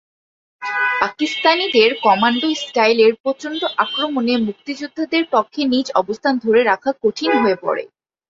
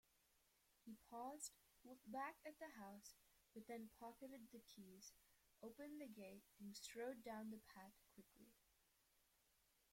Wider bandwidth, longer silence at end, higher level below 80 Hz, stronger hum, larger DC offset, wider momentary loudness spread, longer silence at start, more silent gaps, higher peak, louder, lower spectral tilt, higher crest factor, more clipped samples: second, 7.8 kHz vs 16.5 kHz; second, 0.45 s vs 0.7 s; first, -62 dBFS vs -86 dBFS; neither; neither; about the same, 10 LU vs 12 LU; first, 0.6 s vs 0.3 s; first, 3.20-3.24 s vs none; first, 0 dBFS vs -40 dBFS; first, -17 LUFS vs -58 LUFS; about the same, -4 dB/octave vs -3.5 dB/octave; about the same, 16 dB vs 20 dB; neither